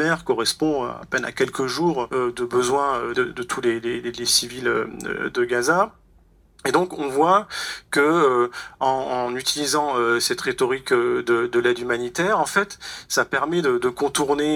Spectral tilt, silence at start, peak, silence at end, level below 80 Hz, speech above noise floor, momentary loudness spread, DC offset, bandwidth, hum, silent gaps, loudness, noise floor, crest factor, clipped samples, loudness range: -3.5 dB/octave; 0 s; -4 dBFS; 0 s; -56 dBFS; 33 dB; 7 LU; under 0.1%; 18 kHz; none; none; -22 LUFS; -55 dBFS; 18 dB; under 0.1%; 2 LU